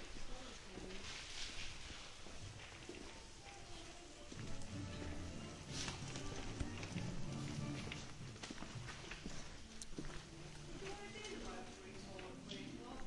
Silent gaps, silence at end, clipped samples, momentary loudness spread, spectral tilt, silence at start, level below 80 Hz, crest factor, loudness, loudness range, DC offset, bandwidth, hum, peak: none; 0 s; under 0.1%; 8 LU; -4 dB/octave; 0 s; -56 dBFS; 20 dB; -50 LUFS; 5 LU; under 0.1%; 11.5 kHz; none; -28 dBFS